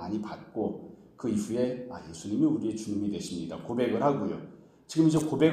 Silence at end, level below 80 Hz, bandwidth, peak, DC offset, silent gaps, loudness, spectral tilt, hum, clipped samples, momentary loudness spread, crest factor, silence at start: 0 s; -64 dBFS; 14.5 kHz; -10 dBFS; under 0.1%; none; -30 LUFS; -6.5 dB/octave; none; under 0.1%; 16 LU; 20 dB; 0 s